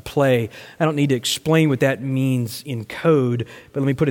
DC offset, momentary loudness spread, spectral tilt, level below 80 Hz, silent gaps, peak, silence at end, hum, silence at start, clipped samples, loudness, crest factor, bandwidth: under 0.1%; 10 LU; -6 dB/octave; -54 dBFS; none; -4 dBFS; 0 s; none; 0.05 s; under 0.1%; -20 LUFS; 14 dB; 17 kHz